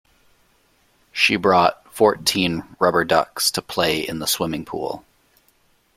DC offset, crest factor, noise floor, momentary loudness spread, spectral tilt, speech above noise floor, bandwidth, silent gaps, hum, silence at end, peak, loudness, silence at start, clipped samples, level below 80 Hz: under 0.1%; 22 dB; -61 dBFS; 12 LU; -3 dB/octave; 41 dB; 16.5 kHz; none; none; 0.95 s; 0 dBFS; -19 LUFS; 1.15 s; under 0.1%; -54 dBFS